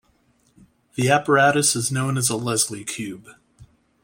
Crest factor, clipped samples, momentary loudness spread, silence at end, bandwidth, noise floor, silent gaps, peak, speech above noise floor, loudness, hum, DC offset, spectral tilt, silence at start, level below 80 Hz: 20 dB; under 0.1%; 16 LU; 0.4 s; 16.5 kHz; -62 dBFS; none; -2 dBFS; 41 dB; -20 LUFS; none; under 0.1%; -3.5 dB/octave; 0.95 s; -60 dBFS